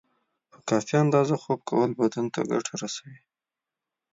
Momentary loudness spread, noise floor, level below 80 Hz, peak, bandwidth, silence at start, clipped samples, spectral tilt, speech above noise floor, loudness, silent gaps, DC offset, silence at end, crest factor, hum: 12 LU; -89 dBFS; -72 dBFS; -8 dBFS; 8 kHz; 0.65 s; under 0.1%; -6 dB/octave; 64 dB; -26 LUFS; none; under 0.1%; 0.95 s; 18 dB; none